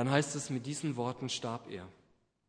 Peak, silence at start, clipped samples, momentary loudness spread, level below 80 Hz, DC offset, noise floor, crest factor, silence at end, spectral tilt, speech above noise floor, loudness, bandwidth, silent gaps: -12 dBFS; 0 s; under 0.1%; 15 LU; -74 dBFS; under 0.1%; -71 dBFS; 24 dB; 0.55 s; -4.5 dB/octave; 35 dB; -36 LUFS; 10.5 kHz; none